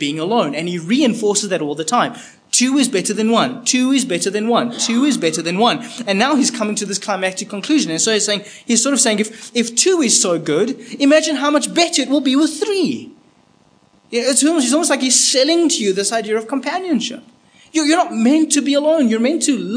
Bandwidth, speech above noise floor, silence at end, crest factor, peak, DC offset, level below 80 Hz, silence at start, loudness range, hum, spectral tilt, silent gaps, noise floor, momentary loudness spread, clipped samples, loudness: 10.5 kHz; 37 dB; 0 s; 16 dB; 0 dBFS; under 0.1%; -72 dBFS; 0 s; 2 LU; none; -2.5 dB/octave; none; -54 dBFS; 8 LU; under 0.1%; -16 LUFS